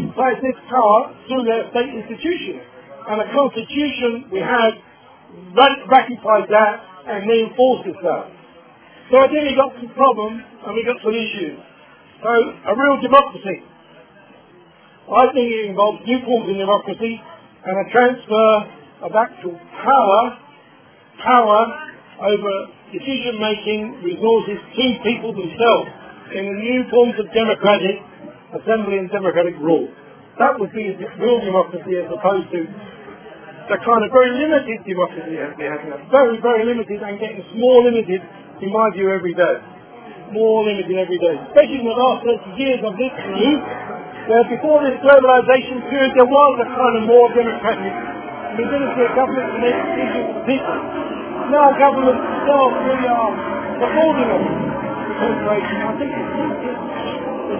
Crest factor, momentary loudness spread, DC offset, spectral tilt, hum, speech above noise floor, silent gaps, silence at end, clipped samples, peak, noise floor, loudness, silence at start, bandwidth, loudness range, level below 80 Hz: 18 dB; 14 LU; under 0.1%; -9 dB/octave; none; 31 dB; none; 0 s; under 0.1%; 0 dBFS; -48 dBFS; -17 LUFS; 0 s; 4 kHz; 5 LU; -54 dBFS